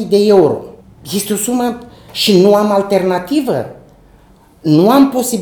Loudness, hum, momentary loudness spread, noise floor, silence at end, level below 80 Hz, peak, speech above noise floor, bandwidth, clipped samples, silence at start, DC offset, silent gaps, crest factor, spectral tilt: -12 LUFS; none; 13 LU; -45 dBFS; 0 s; -50 dBFS; 0 dBFS; 33 dB; over 20 kHz; under 0.1%; 0 s; under 0.1%; none; 12 dB; -5 dB/octave